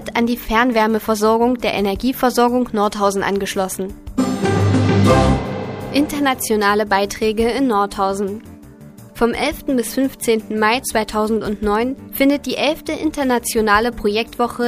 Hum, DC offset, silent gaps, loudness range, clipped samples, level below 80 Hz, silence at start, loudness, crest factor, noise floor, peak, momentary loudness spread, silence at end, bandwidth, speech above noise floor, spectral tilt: none; under 0.1%; none; 3 LU; under 0.1%; -36 dBFS; 0 s; -18 LUFS; 18 dB; -39 dBFS; 0 dBFS; 6 LU; 0 s; 15.5 kHz; 22 dB; -5 dB/octave